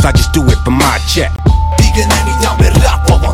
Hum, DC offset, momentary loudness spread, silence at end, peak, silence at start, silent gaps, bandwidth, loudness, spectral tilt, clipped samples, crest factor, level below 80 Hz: none; under 0.1%; 3 LU; 0 s; 0 dBFS; 0 s; none; 16 kHz; -11 LUFS; -5 dB/octave; 0.4%; 8 dB; -12 dBFS